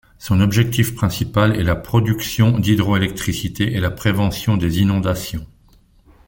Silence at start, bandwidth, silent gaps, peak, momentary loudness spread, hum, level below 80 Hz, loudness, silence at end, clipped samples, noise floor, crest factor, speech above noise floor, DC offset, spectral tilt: 0.2 s; 17 kHz; none; -2 dBFS; 6 LU; none; -38 dBFS; -18 LUFS; 0.85 s; under 0.1%; -52 dBFS; 16 dB; 35 dB; under 0.1%; -6 dB/octave